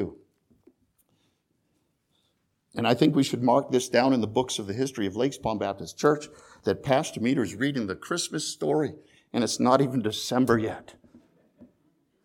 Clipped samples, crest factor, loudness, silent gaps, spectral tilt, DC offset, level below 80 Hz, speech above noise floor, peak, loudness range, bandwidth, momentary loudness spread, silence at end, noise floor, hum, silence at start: under 0.1%; 22 dB; -26 LUFS; none; -5 dB/octave; under 0.1%; -62 dBFS; 48 dB; -6 dBFS; 3 LU; 17 kHz; 10 LU; 0.6 s; -73 dBFS; none; 0 s